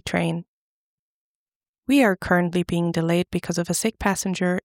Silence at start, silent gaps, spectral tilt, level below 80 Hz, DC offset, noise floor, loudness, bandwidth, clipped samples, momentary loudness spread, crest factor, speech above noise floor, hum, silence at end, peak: 0.05 s; 0.48-1.60 s, 1.68-1.83 s; -5 dB/octave; -50 dBFS; under 0.1%; under -90 dBFS; -22 LUFS; 17.5 kHz; under 0.1%; 7 LU; 18 dB; over 68 dB; none; 0.05 s; -6 dBFS